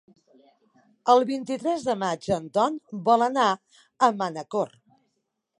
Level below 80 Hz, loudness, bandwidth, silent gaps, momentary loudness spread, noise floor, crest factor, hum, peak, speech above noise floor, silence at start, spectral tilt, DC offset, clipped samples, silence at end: -66 dBFS; -25 LUFS; 11 kHz; none; 9 LU; -78 dBFS; 20 dB; none; -4 dBFS; 54 dB; 1.05 s; -5 dB/octave; under 0.1%; under 0.1%; 0.95 s